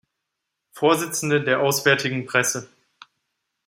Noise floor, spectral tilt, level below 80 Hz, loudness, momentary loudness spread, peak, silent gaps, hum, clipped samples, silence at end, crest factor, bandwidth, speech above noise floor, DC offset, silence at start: -81 dBFS; -3.5 dB/octave; -68 dBFS; -21 LUFS; 4 LU; -2 dBFS; none; none; under 0.1%; 1 s; 22 dB; 16.5 kHz; 60 dB; under 0.1%; 0.75 s